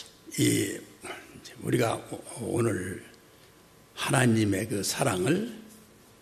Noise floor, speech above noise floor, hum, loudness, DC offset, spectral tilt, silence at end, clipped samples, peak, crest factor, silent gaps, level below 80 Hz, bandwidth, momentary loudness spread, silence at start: -56 dBFS; 29 dB; none; -28 LUFS; under 0.1%; -4.5 dB/octave; 0.4 s; under 0.1%; -8 dBFS; 22 dB; none; -64 dBFS; 14 kHz; 17 LU; 0 s